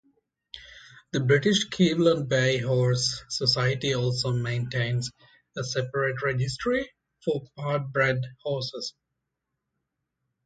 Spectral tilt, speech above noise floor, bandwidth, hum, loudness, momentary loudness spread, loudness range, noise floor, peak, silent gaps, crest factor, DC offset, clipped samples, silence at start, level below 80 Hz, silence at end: -5 dB/octave; 57 dB; 9.2 kHz; none; -26 LUFS; 14 LU; 6 LU; -83 dBFS; -8 dBFS; none; 20 dB; under 0.1%; under 0.1%; 0.55 s; -58 dBFS; 1.55 s